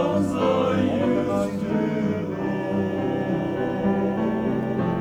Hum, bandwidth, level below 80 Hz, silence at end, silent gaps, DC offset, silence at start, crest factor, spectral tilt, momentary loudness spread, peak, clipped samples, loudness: none; 11 kHz; -50 dBFS; 0 s; none; under 0.1%; 0 s; 12 dB; -8 dB/octave; 4 LU; -10 dBFS; under 0.1%; -24 LUFS